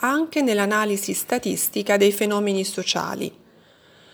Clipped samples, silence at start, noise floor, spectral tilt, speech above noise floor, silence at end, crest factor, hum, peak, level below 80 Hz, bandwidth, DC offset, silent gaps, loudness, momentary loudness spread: under 0.1%; 0 s; -53 dBFS; -3.5 dB/octave; 32 dB; 0.85 s; 18 dB; none; -6 dBFS; -68 dBFS; over 20 kHz; under 0.1%; none; -22 LUFS; 6 LU